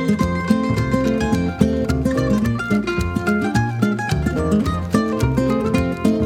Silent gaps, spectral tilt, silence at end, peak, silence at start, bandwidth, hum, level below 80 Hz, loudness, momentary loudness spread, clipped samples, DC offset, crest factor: none; -7 dB/octave; 0 s; -2 dBFS; 0 s; 16 kHz; none; -32 dBFS; -19 LUFS; 2 LU; under 0.1%; under 0.1%; 18 dB